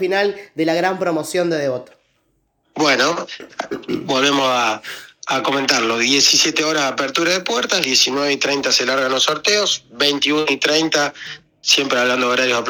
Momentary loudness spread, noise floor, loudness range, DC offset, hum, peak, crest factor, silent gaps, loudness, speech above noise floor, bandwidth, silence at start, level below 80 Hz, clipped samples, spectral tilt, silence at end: 12 LU; -65 dBFS; 5 LU; under 0.1%; none; 0 dBFS; 18 dB; none; -16 LUFS; 47 dB; over 20 kHz; 0 s; -62 dBFS; under 0.1%; -2 dB/octave; 0 s